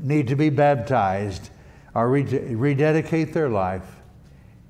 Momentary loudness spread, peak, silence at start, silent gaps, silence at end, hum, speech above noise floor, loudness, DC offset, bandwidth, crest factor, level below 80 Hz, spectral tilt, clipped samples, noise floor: 10 LU; -8 dBFS; 0 s; none; 0.75 s; none; 27 dB; -22 LUFS; under 0.1%; 10 kHz; 14 dB; -52 dBFS; -8 dB/octave; under 0.1%; -48 dBFS